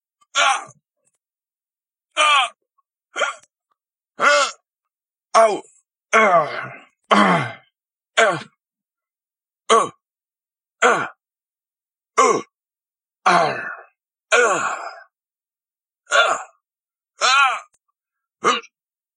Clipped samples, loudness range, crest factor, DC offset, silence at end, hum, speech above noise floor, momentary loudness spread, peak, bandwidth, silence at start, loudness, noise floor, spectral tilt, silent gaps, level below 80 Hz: under 0.1%; 4 LU; 22 dB; under 0.1%; 0.55 s; none; over 73 dB; 14 LU; 0 dBFS; 11 kHz; 0.35 s; -18 LUFS; under -90 dBFS; -2.5 dB/octave; none; -80 dBFS